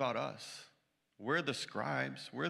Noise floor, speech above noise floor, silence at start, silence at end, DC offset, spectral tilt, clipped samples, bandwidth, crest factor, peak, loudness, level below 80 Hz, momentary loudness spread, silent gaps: -76 dBFS; 37 dB; 0 s; 0 s; under 0.1%; -4.5 dB/octave; under 0.1%; 14.5 kHz; 18 dB; -20 dBFS; -38 LUFS; -86 dBFS; 13 LU; none